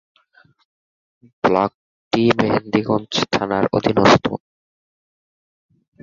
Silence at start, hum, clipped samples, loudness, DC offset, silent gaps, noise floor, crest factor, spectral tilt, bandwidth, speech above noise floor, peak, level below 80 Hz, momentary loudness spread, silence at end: 1.45 s; none; under 0.1%; -18 LUFS; under 0.1%; 1.74-2.11 s; -56 dBFS; 20 dB; -5.5 dB/octave; 7.6 kHz; 38 dB; -2 dBFS; -52 dBFS; 9 LU; 1.65 s